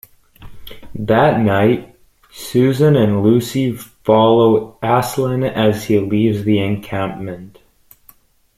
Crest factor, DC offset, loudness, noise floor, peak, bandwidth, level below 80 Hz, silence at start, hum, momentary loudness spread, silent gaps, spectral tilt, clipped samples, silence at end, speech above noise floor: 14 dB; under 0.1%; -15 LUFS; -50 dBFS; -2 dBFS; 15.5 kHz; -48 dBFS; 0.4 s; none; 12 LU; none; -7 dB/octave; under 0.1%; 1.1 s; 36 dB